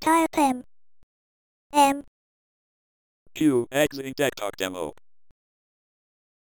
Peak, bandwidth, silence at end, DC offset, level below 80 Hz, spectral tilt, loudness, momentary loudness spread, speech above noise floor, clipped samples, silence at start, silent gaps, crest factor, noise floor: -8 dBFS; 18 kHz; 1.5 s; under 0.1%; -62 dBFS; -4 dB/octave; -24 LUFS; 13 LU; over 67 dB; under 0.1%; 0 s; 1.03-1.70 s, 2.08-3.26 s; 20 dB; under -90 dBFS